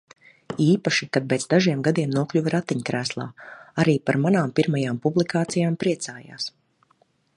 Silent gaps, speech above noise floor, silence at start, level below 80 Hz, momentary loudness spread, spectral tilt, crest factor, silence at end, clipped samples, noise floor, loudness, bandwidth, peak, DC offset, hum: none; 42 dB; 0.5 s; -64 dBFS; 12 LU; -5.5 dB/octave; 18 dB; 0.85 s; under 0.1%; -64 dBFS; -23 LUFS; 11 kHz; -4 dBFS; under 0.1%; none